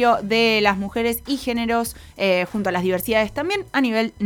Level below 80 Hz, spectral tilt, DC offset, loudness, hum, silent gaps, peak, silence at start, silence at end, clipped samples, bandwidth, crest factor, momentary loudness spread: -46 dBFS; -4.5 dB/octave; under 0.1%; -21 LUFS; none; none; -2 dBFS; 0 s; 0 s; under 0.1%; over 20 kHz; 18 dB; 7 LU